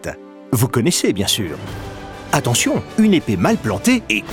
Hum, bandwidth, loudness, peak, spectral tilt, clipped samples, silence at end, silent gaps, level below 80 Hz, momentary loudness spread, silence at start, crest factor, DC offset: none; 18.5 kHz; -17 LUFS; -2 dBFS; -4.5 dB/octave; under 0.1%; 0 s; none; -44 dBFS; 16 LU; 0 s; 16 dB; under 0.1%